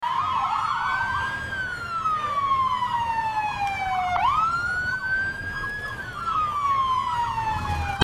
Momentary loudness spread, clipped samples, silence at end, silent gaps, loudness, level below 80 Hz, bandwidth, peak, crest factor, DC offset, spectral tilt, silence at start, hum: 6 LU; under 0.1%; 0 s; none; -25 LUFS; -44 dBFS; 15.5 kHz; -4 dBFS; 22 dB; under 0.1%; -4 dB/octave; 0 s; none